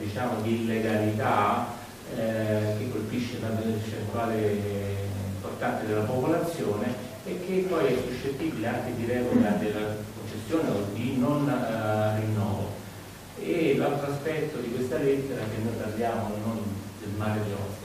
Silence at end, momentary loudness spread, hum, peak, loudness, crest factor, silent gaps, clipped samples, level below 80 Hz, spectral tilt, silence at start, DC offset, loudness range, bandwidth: 0 s; 9 LU; none; -10 dBFS; -29 LUFS; 18 dB; none; under 0.1%; -54 dBFS; -6.5 dB/octave; 0 s; under 0.1%; 2 LU; 15.5 kHz